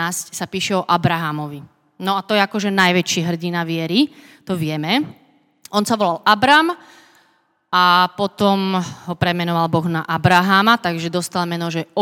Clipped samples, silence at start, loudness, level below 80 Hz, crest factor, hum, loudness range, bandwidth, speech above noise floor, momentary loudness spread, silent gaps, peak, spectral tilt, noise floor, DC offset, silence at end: under 0.1%; 0 s; -18 LUFS; -56 dBFS; 18 dB; none; 3 LU; 17.5 kHz; 43 dB; 11 LU; none; 0 dBFS; -4.5 dB/octave; -61 dBFS; under 0.1%; 0 s